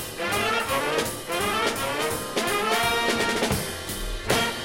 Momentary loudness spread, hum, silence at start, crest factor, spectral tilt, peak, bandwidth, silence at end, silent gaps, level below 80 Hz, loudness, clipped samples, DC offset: 5 LU; none; 0 s; 18 dB; -3 dB/octave; -8 dBFS; 16.5 kHz; 0 s; none; -42 dBFS; -25 LUFS; under 0.1%; under 0.1%